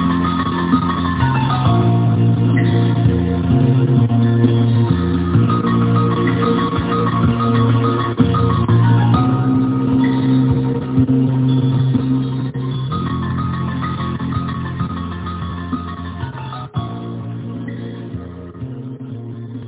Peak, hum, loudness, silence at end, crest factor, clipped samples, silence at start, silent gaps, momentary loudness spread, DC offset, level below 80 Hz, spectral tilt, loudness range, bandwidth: 0 dBFS; none; -16 LUFS; 0 s; 16 dB; under 0.1%; 0 s; none; 13 LU; under 0.1%; -34 dBFS; -12 dB/octave; 11 LU; 4 kHz